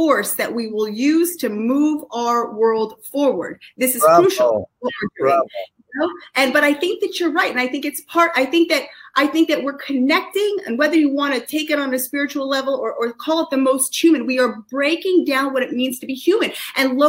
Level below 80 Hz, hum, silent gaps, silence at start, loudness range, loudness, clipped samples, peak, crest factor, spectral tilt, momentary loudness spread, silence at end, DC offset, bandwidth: -66 dBFS; none; none; 0 s; 2 LU; -18 LUFS; under 0.1%; -2 dBFS; 18 dB; -3 dB/octave; 7 LU; 0 s; under 0.1%; 16 kHz